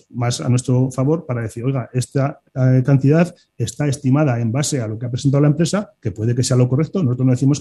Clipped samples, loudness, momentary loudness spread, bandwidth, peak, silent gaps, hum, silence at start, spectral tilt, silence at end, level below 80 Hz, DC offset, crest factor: under 0.1%; -18 LUFS; 8 LU; 12 kHz; -2 dBFS; none; none; 0.15 s; -6.5 dB/octave; 0 s; -54 dBFS; under 0.1%; 14 dB